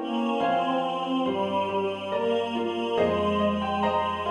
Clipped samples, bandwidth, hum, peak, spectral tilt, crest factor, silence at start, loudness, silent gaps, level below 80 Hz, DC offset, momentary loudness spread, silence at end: under 0.1%; 11 kHz; none; -12 dBFS; -6.5 dB/octave; 14 dB; 0 s; -26 LUFS; none; -56 dBFS; under 0.1%; 4 LU; 0 s